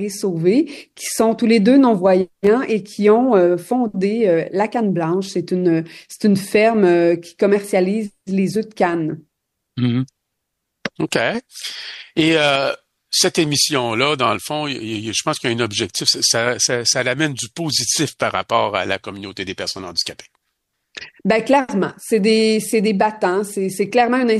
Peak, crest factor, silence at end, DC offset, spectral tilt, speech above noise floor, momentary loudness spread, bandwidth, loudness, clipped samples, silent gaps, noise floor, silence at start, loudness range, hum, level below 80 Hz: -2 dBFS; 16 dB; 0 s; under 0.1%; -4 dB/octave; 59 dB; 11 LU; 12.5 kHz; -18 LUFS; under 0.1%; none; -76 dBFS; 0 s; 6 LU; none; -60 dBFS